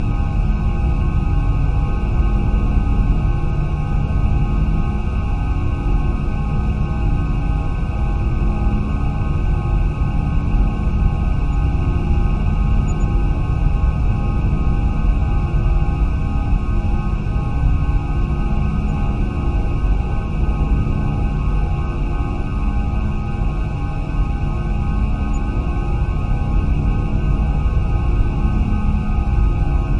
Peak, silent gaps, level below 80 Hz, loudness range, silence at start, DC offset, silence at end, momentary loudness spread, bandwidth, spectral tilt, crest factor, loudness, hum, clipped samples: -4 dBFS; none; -18 dBFS; 2 LU; 0 s; under 0.1%; 0 s; 3 LU; 7.2 kHz; -9 dB/octave; 12 dB; -20 LUFS; none; under 0.1%